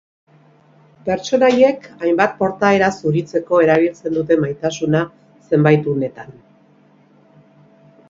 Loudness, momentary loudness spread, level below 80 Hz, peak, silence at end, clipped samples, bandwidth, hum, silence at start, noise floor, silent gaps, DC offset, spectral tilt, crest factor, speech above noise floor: -17 LUFS; 9 LU; -56 dBFS; 0 dBFS; 1.8 s; under 0.1%; 7.6 kHz; 50 Hz at -40 dBFS; 1.05 s; -51 dBFS; none; under 0.1%; -6.5 dB/octave; 18 dB; 36 dB